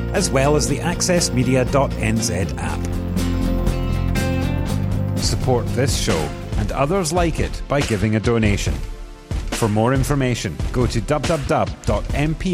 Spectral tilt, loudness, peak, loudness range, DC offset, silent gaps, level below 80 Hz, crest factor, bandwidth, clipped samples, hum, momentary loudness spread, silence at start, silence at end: -5 dB/octave; -20 LUFS; -4 dBFS; 2 LU; under 0.1%; none; -28 dBFS; 16 dB; 16.5 kHz; under 0.1%; none; 7 LU; 0 s; 0 s